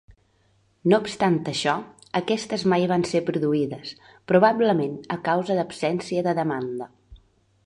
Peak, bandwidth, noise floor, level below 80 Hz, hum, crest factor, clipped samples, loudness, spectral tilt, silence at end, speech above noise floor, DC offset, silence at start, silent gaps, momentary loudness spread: -4 dBFS; 11 kHz; -64 dBFS; -60 dBFS; none; 20 dB; under 0.1%; -23 LUFS; -6 dB/octave; 0.5 s; 41 dB; under 0.1%; 0.85 s; none; 11 LU